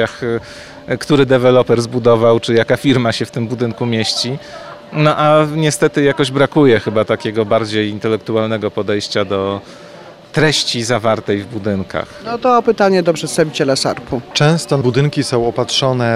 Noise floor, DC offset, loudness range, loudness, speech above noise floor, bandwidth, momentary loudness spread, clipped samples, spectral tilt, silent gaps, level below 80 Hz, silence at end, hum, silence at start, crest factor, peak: -36 dBFS; under 0.1%; 4 LU; -15 LUFS; 22 dB; 15 kHz; 10 LU; under 0.1%; -5 dB/octave; none; -48 dBFS; 0 s; none; 0 s; 14 dB; -2 dBFS